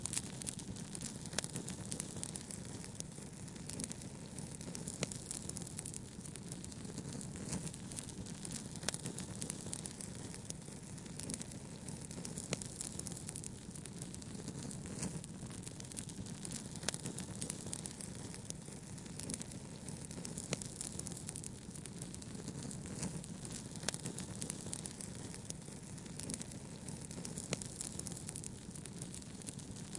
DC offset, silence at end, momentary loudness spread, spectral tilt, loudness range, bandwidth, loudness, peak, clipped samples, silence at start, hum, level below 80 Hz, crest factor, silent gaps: under 0.1%; 0 s; 6 LU; -3.5 dB/octave; 1 LU; 11.5 kHz; -45 LUFS; -16 dBFS; under 0.1%; 0 s; none; -62 dBFS; 30 dB; none